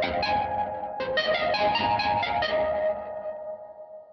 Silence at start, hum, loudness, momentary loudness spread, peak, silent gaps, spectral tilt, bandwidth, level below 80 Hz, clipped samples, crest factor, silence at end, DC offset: 0 s; none; -26 LUFS; 14 LU; -14 dBFS; none; -5 dB/octave; 6.2 kHz; -54 dBFS; under 0.1%; 14 dB; 0 s; under 0.1%